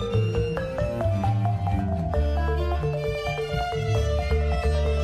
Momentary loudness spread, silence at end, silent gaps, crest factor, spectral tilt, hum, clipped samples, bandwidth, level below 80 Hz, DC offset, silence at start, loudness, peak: 3 LU; 0 s; none; 12 dB; -7 dB/octave; none; under 0.1%; 9.8 kHz; -28 dBFS; under 0.1%; 0 s; -26 LUFS; -12 dBFS